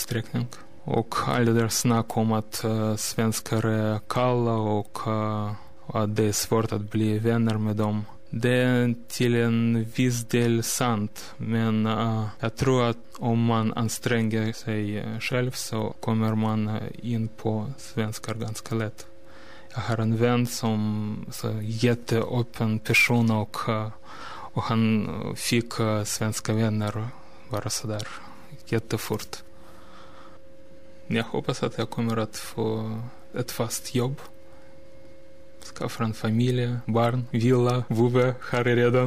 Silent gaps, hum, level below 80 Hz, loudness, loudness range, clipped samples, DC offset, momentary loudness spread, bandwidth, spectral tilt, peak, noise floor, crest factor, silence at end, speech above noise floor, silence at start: none; none; -56 dBFS; -26 LUFS; 7 LU; under 0.1%; 1%; 10 LU; 15.5 kHz; -5.5 dB/octave; -8 dBFS; -51 dBFS; 18 dB; 0 s; 26 dB; 0 s